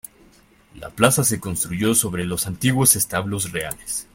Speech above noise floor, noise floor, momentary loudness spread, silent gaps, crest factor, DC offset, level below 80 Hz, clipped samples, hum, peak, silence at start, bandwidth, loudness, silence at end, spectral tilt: 32 dB; -53 dBFS; 12 LU; none; 22 dB; under 0.1%; -48 dBFS; under 0.1%; none; 0 dBFS; 0.75 s; 16.5 kHz; -19 LUFS; 0.1 s; -3.5 dB/octave